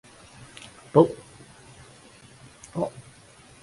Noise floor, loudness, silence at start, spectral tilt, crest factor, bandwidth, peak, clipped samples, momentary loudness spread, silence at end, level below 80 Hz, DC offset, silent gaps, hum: -52 dBFS; -24 LUFS; 0.95 s; -7.5 dB/octave; 26 dB; 11.5 kHz; -2 dBFS; under 0.1%; 28 LU; 0.75 s; -62 dBFS; under 0.1%; none; none